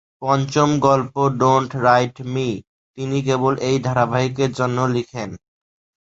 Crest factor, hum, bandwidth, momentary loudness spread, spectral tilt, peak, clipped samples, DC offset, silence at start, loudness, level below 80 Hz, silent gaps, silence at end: 18 dB; none; 8 kHz; 9 LU; -6 dB/octave; 0 dBFS; under 0.1%; under 0.1%; 0.2 s; -19 LUFS; -54 dBFS; 2.67-2.94 s; 0.65 s